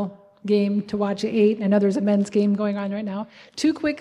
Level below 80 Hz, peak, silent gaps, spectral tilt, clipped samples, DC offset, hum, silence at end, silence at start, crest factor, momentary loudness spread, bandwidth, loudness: -64 dBFS; -8 dBFS; none; -7 dB/octave; under 0.1%; under 0.1%; none; 0 s; 0 s; 14 dB; 12 LU; 10.5 kHz; -22 LUFS